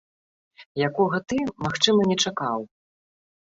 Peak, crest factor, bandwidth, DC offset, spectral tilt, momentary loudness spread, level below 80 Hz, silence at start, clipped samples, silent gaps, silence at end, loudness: -4 dBFS; 22 dB; 8 kHz; under 0.1%; -4 dB/octave; 12 LU; -60 dBFS; 0.6 s; under 0.1%; 0.66-0.75 s; 0.95 s; -23 LUFS